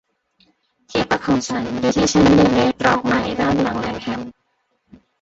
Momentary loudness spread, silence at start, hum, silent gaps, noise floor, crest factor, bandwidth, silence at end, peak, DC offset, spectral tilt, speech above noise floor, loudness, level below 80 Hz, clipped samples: 12 LU; 0.9 s; none; none; -68 dBFS; 18 dB; 8 kHz; 0.9 s; -2 dBFS; under 0.1%; -5 dB/octave; 51 dB; -18 LUFS; -42 dBFS; under 0.1%